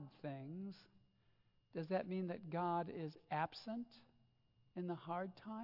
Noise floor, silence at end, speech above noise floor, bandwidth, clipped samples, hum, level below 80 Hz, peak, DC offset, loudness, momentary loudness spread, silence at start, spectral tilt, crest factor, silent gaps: -76 dBFS; 0 s; 31 dB; 5.8 kHz; under 0.1%; none; -84 dBFS; -26 dBFS; under 0.1%; -45 LUFS; 11 LU; 0 s; -6 dB/octave; 20 dB; none